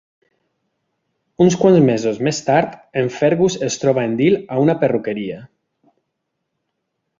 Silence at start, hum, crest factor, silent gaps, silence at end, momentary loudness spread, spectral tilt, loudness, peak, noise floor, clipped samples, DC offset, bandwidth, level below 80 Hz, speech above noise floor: 1.4 s; none; 18 dB; none; 1.75 s; 10 LU; -6 dB/octave; -17 LUFS; -2 dBFS; -75 dBFS; under 0.1%; under 0.1%; 7.6 kHz; -56 dBFS; 59 dB